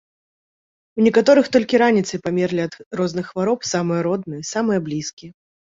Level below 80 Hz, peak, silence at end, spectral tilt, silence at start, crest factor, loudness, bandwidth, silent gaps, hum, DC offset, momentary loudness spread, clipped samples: -60 dBFS; -2 dBFS; 0.45 s; -5.5 dB/octave; 0.95 s; 18 dB; -19 LUFS; 7.8 kHz; 2.86-2.91 s, 5.13-5.17 s; none; under 0.1%; 12 LU; under 0.1%